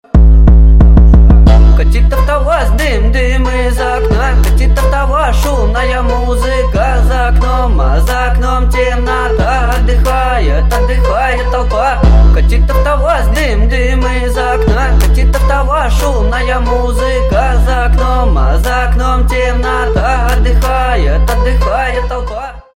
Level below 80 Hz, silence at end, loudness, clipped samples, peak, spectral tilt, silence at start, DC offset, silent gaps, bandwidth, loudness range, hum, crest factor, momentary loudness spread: -10 dBFS; 0.15 s; -11 LUFS; under 0.1%; 0 dBFS; -6.5 dB/octave; 0.15 s; 0.4%; none; 12.5 kHz; 3 LU; none; 8 dB; 7 LU